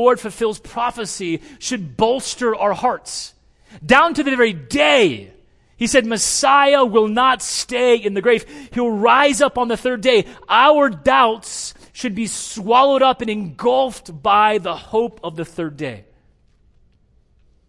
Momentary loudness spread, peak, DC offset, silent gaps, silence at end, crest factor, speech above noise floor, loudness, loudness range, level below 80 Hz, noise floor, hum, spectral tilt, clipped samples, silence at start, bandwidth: 14 LU; 0 dBFS; under 0.1%; none; 1.7 s; 18 dB; 39 dB; -17 LUFS; 6 LU; -50 dBFS; -56 dBFS; none; -3 dB/octave; under 0.1%; 0 s; 12 kHz